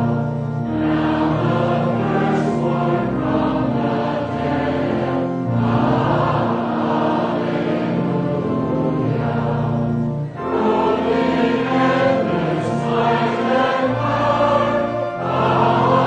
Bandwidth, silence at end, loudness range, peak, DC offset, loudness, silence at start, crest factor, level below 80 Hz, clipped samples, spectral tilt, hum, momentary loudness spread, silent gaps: 9.2 kHz; 0 s; 2 LU; -2 dBFS; under 0.1%; -19 LUFS; 0 s; 16 dB; -44 dBFS; under 0.1%; -8 dB/octave; none; 5 LU; none